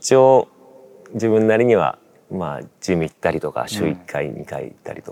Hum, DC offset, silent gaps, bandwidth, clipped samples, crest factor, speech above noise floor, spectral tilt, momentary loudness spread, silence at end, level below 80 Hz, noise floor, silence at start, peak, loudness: none; under 0.1%; none; 15.5 kHz; under 0.1%; 18 dB; 27 dB; -5.5 dB/octave; 18 LU; 0 s; -58 dBFS; -46 dBFS; 0 s; -2 dBFS; -19 LUFS